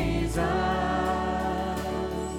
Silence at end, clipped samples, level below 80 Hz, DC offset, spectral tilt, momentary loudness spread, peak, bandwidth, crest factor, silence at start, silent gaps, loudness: 0 s; under 0.1%; -38 dBFS; under 0.1%; -6 dB/octave; 4 LU; -14 dBFS; 19 kHz; 14 dB; 0 s; none; -28 LUFS